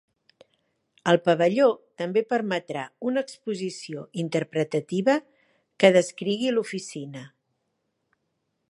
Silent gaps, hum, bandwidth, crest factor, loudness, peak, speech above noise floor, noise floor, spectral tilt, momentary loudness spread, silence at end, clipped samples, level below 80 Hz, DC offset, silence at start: none; none; 11.5 kHz; 24 dB; -25 LUFS; -2 dBFS; 52 dB; -77 dBFS; -5.5 dB/octave; 15 LU; 1.45 s; under 0.1%; -76 dBFS; under 0.1%; 1.05 s